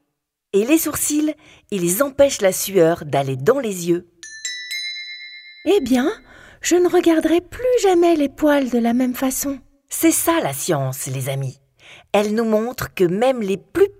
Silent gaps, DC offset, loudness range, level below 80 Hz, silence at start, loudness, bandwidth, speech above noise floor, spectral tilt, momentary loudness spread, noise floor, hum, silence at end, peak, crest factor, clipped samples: none; under 0.1%; 4 LU; -50 dBFS; 0.55 s; -19 LUFS; 16 kHz; 58 dB; -4.5 dB/octave; 12 LU; -76 dBFS; none; 0.1 s; -2 dBFS; 16 dB; under 0.1%